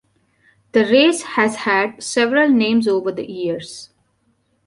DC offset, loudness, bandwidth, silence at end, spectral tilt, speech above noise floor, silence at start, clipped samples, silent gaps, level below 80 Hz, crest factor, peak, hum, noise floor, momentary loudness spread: under 0.1%; -17 LUFS; 11.5 kHz; 0.8 s; -4 dB/octave; 47 dB; 0.75 s; under 0.1%; none; -62 dBFS; 16 dB; -2 dBFS; none; -64 dBFS; 11 LU